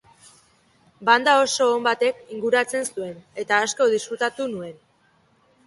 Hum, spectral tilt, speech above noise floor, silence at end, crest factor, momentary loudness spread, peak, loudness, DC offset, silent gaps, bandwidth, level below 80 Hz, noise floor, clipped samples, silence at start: none; -2 dB/octave; 40 dB; 0.95 s; 22 dB; 16 LU; -2 dBFS; -21 LUFS; under 0.1%; none; 12 kHz; -70 dBFS; -61 dBFS; under 0.1%; 1 s